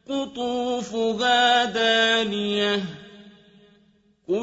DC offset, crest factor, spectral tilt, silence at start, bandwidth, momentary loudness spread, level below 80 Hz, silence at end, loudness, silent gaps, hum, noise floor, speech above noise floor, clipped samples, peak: under 0.1%; 16 dB; -3 dB/octave; 0.1 s; 8 kHz; 11 LU; -62 dBFS; 0 s; -22 LUFS; none; none; -61 dBFS; 38 dB; under 0.1%; -8 dBFS